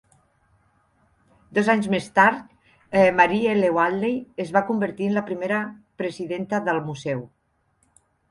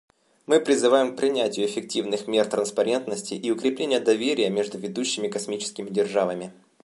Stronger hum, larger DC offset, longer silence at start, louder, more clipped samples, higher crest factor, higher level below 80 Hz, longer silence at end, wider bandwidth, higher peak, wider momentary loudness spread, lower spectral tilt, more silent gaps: neither; neither; first, 1.5 s vs 0.5 s; about the same, -22 LUFS vs -24 LUFS; neither; about the same, 22 dB vs 18 dB; first, -62 dBFS vs -72 dBFS; first, 1.05 s vs 0.3 s; about the same, 11.5 kHz vs 11.5 kHz; first, -2 dBFS vs -6 dBFS; first, 12 LU vs 9 LU; first, -6.5 dB/octave vs -3.5 dB/octave; neither